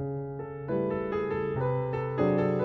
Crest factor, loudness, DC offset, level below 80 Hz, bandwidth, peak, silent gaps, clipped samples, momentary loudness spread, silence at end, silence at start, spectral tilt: 16 dB; -30 LUFS; under 0.1%; -54 dBFS; 5.8 kHz; -14 dBFS; none; under 0.1%; 10 LU; 0 s; 0 s; -10.5 dB/octave